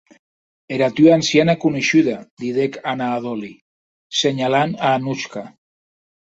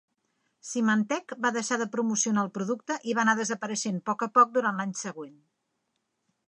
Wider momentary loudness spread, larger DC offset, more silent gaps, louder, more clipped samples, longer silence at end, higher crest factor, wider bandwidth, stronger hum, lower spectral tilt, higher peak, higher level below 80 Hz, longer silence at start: about the same, 14 LU vs 12 LU; neither; first, 2.31-2.37 s, 3.61-4.10 s vs none; first, -18 LUFS vs -27 LUFS; neither; second, 0.9 s vs 1.15 s; about the same, 18 dB vs 20 dB; second, 8 kHz vs 11 kHz; neither; about the same, -5 dB/octave vs -4 dB/octave; first, -2 dBFS vs -8 dBFS; first, -60 dBFS vs -82 dBFS; about the same, 0.7 s vs 0.65 s